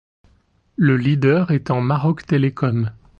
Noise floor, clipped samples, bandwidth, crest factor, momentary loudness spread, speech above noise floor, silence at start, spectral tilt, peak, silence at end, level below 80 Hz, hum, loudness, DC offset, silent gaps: -59 dBFS; under 0.1%; 6.8 kHz; 14 dB; 5 LU; 41 dB; 0.8 s; -9 dB/octave; -4 dBFS; 0.3 s; -52 dBFS; none; -18 LUFS; under 0.1%; none